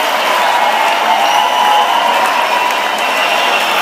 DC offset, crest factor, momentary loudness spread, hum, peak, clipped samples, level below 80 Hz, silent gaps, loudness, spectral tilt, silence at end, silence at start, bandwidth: under 0.1%; 12 dB; 2 LU; none; 0 dBFS; under 0.1%; -72 dBFS; none; -11 LUFS; 0 dB/octave; 0 s; 0 s; 16 kHz